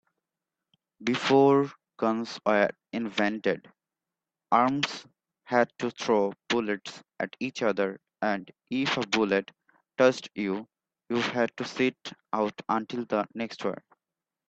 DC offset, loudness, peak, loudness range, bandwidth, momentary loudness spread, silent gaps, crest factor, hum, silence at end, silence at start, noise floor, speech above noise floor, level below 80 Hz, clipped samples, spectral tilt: under 0.1%; -28 LUFS; -6 dBFS; 4 LU; 8.4 kHz; 11 LU; none; 22 dB; none; 0.75 s; 1 s; -90 dBFS; 62 dB; -72 dBFS; under 0.1%; -5 dB/octave